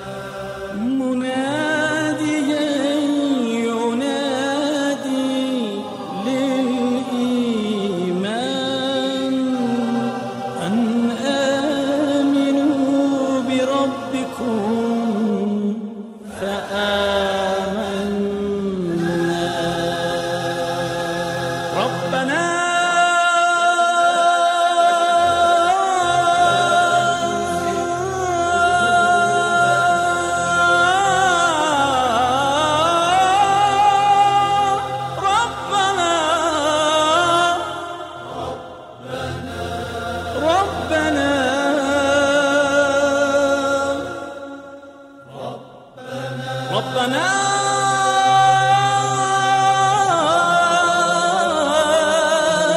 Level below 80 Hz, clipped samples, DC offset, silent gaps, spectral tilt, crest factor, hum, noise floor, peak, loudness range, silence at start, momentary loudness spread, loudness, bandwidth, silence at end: -52 dBFS; under 0.1%; under 0.1%; none; -4 dB/octave; 14 dB; none; -40 dBFS; -4 dBFS; 6 LU; 0 s; 11 LU; -18 LUFS; 14.5 kHz; 0 s